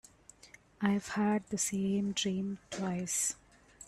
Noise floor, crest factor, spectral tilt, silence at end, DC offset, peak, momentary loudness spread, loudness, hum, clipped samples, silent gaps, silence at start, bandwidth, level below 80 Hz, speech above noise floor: -59 dBFS; 20 dB; -4 dB/octave; 0 s; under 0.1%; -16 dBFS; 6 LU; -33 LUFS; none; under 0.1%; none; 0.45 s; 13 kHz; -66 dBFS; 26 dB